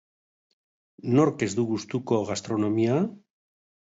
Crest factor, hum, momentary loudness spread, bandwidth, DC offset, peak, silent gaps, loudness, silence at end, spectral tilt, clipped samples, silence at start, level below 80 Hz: 18 dB; none; 7 LU; 8 kHz; under 0.1%; -8 dBFS; none; -26 LUFS; 0.65 s; -6.5 dB/octave; under 0.1%; 1.05 s; -64 dBFS